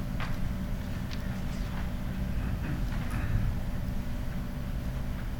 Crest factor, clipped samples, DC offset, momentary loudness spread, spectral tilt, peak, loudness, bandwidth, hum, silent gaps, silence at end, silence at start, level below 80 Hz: 14 dB; under 0.1%; under 0.1%; 4 LU; -7 dB/octave; -16 dBFS; -35 LUFS; 19 kHz; none; none; 0 s; 0 s; -34 dBFS